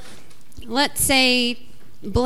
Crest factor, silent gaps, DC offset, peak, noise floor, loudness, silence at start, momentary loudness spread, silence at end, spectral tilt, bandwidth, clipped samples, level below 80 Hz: 18 dB; none; 3%; -4 dBFS; -47 dBFS; -18 LUFS; 0.05 s; 17 LU; 0 s; -2.5 dB/octave; 16 kHz; under 0.1%; -40 dBFS